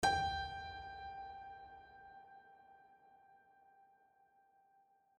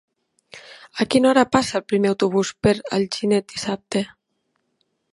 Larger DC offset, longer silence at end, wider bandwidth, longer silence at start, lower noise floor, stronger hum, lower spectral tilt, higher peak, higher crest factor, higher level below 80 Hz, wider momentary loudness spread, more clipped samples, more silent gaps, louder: neither; first, 1.8 s vs 1.05 s; about the same, 10.5 kHz vs 11.5 kHz; second, 0 s vs 0.55 s; about the same, -73 dBFS vs -72 dBFS; neither; second, -3 dB/octave vs -5 dB/octave; second, -22 dBFS vs 0 dBFS; about the same, 24 dB vs 22 dB; second, -62 dBFS vs -52 dBFS; first, 26 LU vs 14 LU; neither; neither; second, -43 LUFS vs -20 LUFS